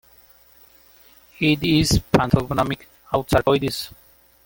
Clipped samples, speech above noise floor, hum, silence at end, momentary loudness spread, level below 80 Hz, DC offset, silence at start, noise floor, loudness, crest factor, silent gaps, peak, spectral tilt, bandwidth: under 0.1%; 33 dB; none; 0.6 s; 10 LU; -38 dBFS; under 0.1%; 1.4 s; -52 dBFS; -20 LUFS; 22 dB; none; 0 dBFS; -5.5 dB/octave; 17 kHz